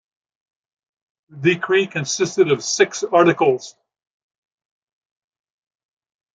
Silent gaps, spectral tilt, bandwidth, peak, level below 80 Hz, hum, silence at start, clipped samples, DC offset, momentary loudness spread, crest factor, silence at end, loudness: none; -4 dB/octave; 9.2 kHz; -2 dBFS; -68 dBFS; none; 1.35 s; under 0.1%; under 0.1%; 6 LU; 20 dB; 2.65 s; -18 LUFS